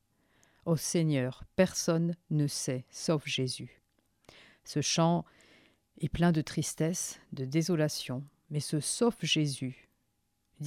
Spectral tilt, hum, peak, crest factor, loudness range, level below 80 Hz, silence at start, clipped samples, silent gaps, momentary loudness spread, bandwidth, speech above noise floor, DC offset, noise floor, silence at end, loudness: -5 dB/octave; none; -12 dBFS; 20 dB; 2 LU; -60 dBFS; 0.65 s; under 0.1%; none; 11 LU; 15.5 kHz; 47 dB; under 0.1%; -78 dBFS; 0 s; -31 LUFS